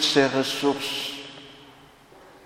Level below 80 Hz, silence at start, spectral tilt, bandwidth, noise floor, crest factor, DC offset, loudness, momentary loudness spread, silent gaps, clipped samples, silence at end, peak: -66 dBFS; 0 s; -3 dB/octave; 16.5 kHz; -51 dBFS; 22 dB; under 0.1%; -24 LUFS; 22 LU; none; under 0.1%; 0.75 s; -4 dBFS